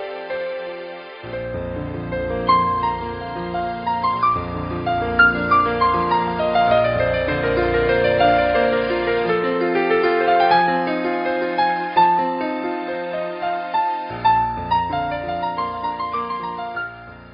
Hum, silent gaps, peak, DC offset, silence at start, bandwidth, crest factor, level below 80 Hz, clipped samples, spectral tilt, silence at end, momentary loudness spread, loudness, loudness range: none; none; -2 dBFS; under 0.1%; 0 s; 5.4 kHz; 18 dB; -42 dBFS; under 0.1%; -3.5 dB/octave; 0 s; 12 LU; -20 LUFS; 5 LU